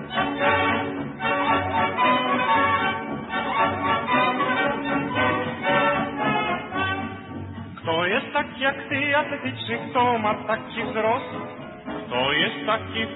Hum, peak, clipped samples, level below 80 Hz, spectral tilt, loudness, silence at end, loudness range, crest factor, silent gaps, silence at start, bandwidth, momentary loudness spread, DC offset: none; -8 dBFS; under 0.1%; -56 dBFS; -9.5 dB/octave; -23 LUFS; 0 s; 3 LU; 16 dB; none; 0 s; 4.1 kHz; 9 LU; under 0.1%